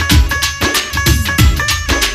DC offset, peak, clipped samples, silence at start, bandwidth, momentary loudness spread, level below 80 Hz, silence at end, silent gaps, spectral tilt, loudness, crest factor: under 0.1%; 0 dBFS; under 0.1%; 0 s; 15.5 kHz; 3 LU; -16 dBFS; 0 s; none; -3.5 dB/octave; -13 LUFS; 12 dB